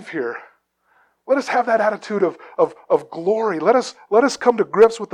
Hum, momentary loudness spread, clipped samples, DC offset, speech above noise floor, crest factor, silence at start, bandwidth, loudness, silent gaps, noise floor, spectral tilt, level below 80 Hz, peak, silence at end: none; 7 LU; under 0.1%; under 0.1%; 43 dB; 18 dB; 0 s; 10.5 kHz; -19 LUFS; none; -61 dBFS; -4.5 dB/octave; -66 dBFS; -2 dBFS; 0.1 s